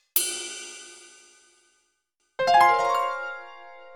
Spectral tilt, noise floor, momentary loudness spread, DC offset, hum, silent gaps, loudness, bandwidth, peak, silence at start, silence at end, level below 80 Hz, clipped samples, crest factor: -0.5 dB/octave; -74 dBFS; 25 LU; under 0.1%; none; none; -23 LUFS; 19.5 kHz; -4 dBFS; 0.15 s; 0.05 s; -72 dBFS; under 0.1%; 22 dB